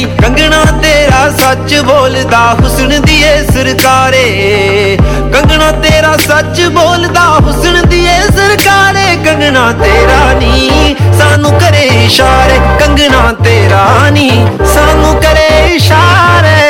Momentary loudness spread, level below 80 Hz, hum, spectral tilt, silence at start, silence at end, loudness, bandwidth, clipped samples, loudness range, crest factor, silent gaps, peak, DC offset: 3 LU; -14 dBFS; none; -4.5 dB/octave; 0 s; 0 s; -6 LUFS; 18.5 kHz; 3%; 1 LU; 6 dB; none; 0 dBFS; under 0.1%